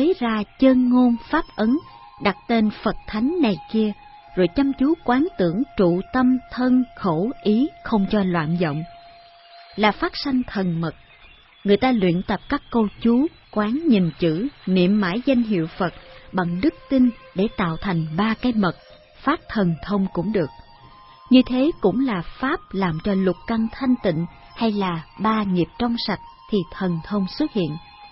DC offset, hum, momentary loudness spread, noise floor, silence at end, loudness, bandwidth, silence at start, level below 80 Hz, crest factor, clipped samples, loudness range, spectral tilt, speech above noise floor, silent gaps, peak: under 0.1%; none; 7 LU; -49 dBFS; 0.05 s; -22 LUFS; 5.8 kHz; 0 s; -46 dBFS; 18 dB; under 0.1%; 3 LU; -11 dB/octave; 29 dB; none; -2 dBFS